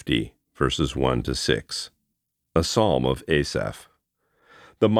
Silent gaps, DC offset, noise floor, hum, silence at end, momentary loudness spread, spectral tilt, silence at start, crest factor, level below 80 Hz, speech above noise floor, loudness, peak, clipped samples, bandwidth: none; under 0.1%; -78 dBFS; none; 0 s; 11 LU; -5 dB/octave; 0.05 s; 20 dB; -40 dBFS; 55 dB; -24 LUFS; -4 dBFS; under 0.1%; 15 kHz